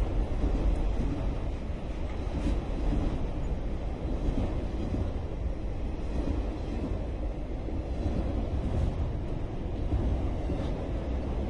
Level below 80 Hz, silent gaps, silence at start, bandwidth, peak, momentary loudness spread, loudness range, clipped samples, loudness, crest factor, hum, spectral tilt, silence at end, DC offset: -32 dBFS; none; 0 s; 8 kHz; -16 dBFS; 5 LU; 2 LU; under 0.1%; -33 LUFS; 14 dB; none; -8.5 dB/octave; 0 s; under 0.1%